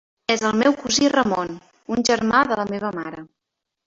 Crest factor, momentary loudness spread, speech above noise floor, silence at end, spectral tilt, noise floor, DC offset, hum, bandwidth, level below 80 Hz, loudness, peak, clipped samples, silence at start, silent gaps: 18 dB; 14 LU; 62 dB; 0.6 s; -3.5 dB/octave; -82 dBFS; under 0.1%; none; 7.8 kHz; -54 dBFS; -20 LUFS; -4 dBFS; under 0.1%; 0.3 s; none